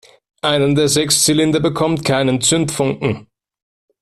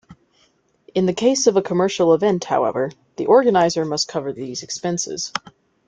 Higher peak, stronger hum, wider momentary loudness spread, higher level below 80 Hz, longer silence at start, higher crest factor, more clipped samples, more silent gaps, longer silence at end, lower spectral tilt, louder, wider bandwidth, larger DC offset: about the same, -2 dBFS vs -2 dBFS; neither; second, 9 LU vs 12 LU; first, -48 dBFS vs -62 dBFS; first, 0.45 s vs 0.1 s; about the same, 14 dB vs 18 dB; neither; neither; first, 0.8 s vs 0.5 s; about the same, -4 dB/octave vs -4.5 dB/octave; first, -15 LUFS vs -19 LUFS; first, 14.5 kHz vs 9.4 kHz; neither